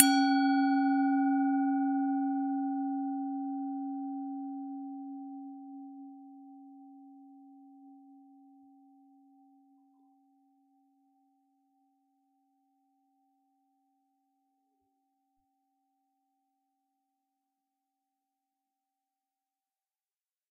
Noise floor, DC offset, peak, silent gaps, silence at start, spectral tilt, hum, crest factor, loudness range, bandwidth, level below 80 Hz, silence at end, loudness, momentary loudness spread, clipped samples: under -90 dBFS; under 0.1%; -2 dBFS; none; 0 s; -0.5 dB/octave; none; 34 dB; 25 LU; 4.6 kHz; under -90 dBFS; 12.55 s; -31 LUFS; 24 LU; under 0.1%